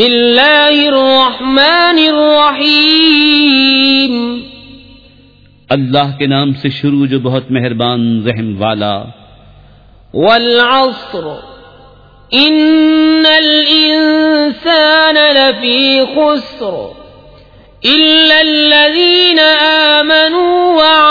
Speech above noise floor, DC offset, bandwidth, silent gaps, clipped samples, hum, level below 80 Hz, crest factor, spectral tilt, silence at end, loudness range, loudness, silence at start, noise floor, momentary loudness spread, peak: 34 dB; under 0.1%; 5.4 kHz; none; 0.2%; none; -48 dBFS; 10 dB; -6 dB/octave; 0 s; 7 LU; -8 LUFS; 0 s; -43 dBFS; 10 LU; 0 dBFS